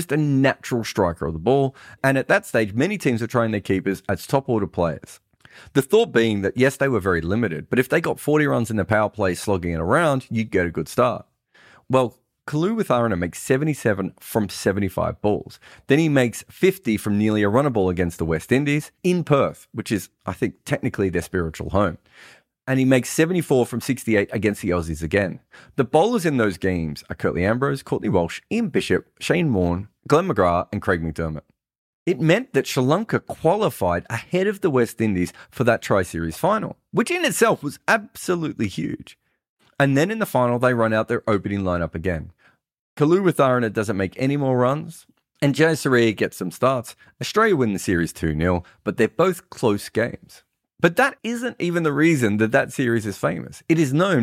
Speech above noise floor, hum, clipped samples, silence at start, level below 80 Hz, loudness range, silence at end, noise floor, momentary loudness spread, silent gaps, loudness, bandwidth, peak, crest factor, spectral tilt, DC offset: 32 dB; none; under 0.1%; 0 s; -48 dBFS; 2 LU; 0 s; -53 dBFS; 8 LU; 31.78-32.06 s, 39.49-39.57 s, 42.81-42.97 s; -21 LUFS; 16 kHz; -2 dBFS; 18 dB; -6 dB/octave; under 0.1%